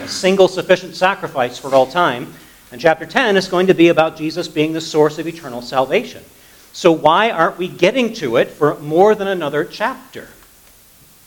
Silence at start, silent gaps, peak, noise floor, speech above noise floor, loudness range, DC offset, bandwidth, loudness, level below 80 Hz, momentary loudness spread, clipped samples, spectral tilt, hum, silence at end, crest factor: 0 s; none; 0 dBFS; -47 dBFS; 31 dB; 2 LU; under 0.1%; 19 kHz; -16 LUFS; -56 dBFS; 12 LU; under 0.1%; -5 dB/octave; none; 1 s; 16 dB